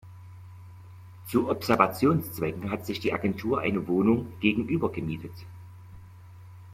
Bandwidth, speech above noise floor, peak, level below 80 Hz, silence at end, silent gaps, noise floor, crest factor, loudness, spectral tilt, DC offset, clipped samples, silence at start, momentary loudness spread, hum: 16.5 kHz; 21 dB; -6 dBFS; -58 dBFS; 0 s; none; -47 dBFS; 24 dB; -27 LUFS; -6.5 dB/octave; under 0.1%; under 0.1%; 0.05 s; 24 LU; none